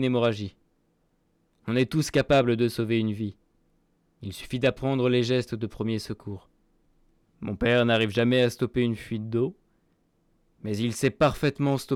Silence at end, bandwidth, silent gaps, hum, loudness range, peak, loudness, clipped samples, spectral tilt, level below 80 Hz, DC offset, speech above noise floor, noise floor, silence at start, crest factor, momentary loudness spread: 0 s; 16 kHz; none; none; 3 LU; -12 dBFS; -26 LUFS; under 0.1%; -6 dB/octave; -52 dBFS; under 0.1%; 44 dB; -69 dBFS; 0 s; 14 dB; 16 LU